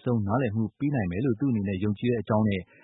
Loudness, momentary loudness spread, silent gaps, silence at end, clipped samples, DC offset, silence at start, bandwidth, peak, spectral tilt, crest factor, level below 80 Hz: -27 LUFS; 3 LU; none; 0.2 s; under 0.1%; under 0.1%; 0.05 s; 4 kHz; -10 dBFS; -12.5 dB/octave; 16 dB; -56 dBFS